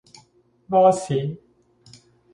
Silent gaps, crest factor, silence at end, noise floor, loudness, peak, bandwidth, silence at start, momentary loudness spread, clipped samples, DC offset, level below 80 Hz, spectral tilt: none; 18 dB; 1 s; -59 dBFS; -20 LUFS; -4 dBFS; 11 kHz; 0.7 s; 16 LU; under 0.1%; under 0.1%; -62 dBFS; -6.5 dB/octave